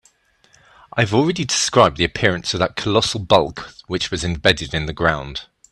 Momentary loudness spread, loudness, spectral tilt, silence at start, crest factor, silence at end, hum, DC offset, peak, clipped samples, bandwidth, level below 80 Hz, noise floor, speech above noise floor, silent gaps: 12 LU; -18 LUFS; -4 dB/octave; 0.95 s; 20 dB; 0.3 s; none; under 0.1%; 0 dBFS; under 0.1%; 12.5 kHz; -42 dBFS; -57 dBFS; 38 dB; none